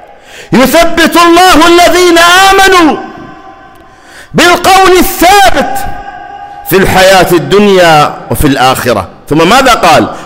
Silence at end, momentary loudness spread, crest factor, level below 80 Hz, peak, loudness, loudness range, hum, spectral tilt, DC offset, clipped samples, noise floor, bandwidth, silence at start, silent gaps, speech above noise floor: 0 s; 13 LU; 6 dB; -24 dBFS; 0 dBFS; -4 LUFS; 3 LU; none; -3.5 dB/octave; under 0.1%; 1%; -33 dBFS; 16.5 kHz; 0.35 s; none; 29 dB